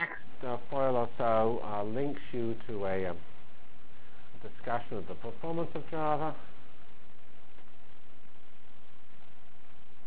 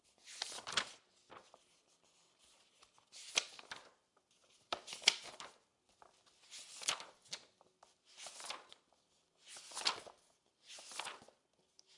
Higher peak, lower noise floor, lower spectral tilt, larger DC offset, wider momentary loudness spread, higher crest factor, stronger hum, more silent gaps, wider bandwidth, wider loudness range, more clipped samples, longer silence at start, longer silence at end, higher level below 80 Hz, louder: second, -18 dBFS vs -10 dBFS; second, -61 dBFS vs -76 dBFS; first, -9.5 dB/octave vs 1.5 dB/octave; first, 4% vs under 0.1%; second, 18 LU vs 23 LU; second, 22 dB vs 38 dB; neither; neither; second, 4 kHz vs 11.5 kHz; about the same, 7 LU vs 7 LU; neither; second, 0 s vs 0.25 s; about the same, 0.1 s vs 0 s; first, -62 dBFS vs -88 dBFS; first, -35 LUFS vs -41 LUFS